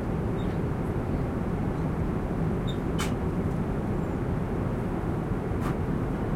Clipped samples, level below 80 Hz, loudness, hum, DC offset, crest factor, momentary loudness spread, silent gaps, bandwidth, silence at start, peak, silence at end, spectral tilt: under 0.1%; -36 dBFS; -30 LUFS; none; under 0.1%; 12 dB; 1 LU; none; 15.5 kHz; 0 s; -16 dBFS; 0 s; -8 dB/octave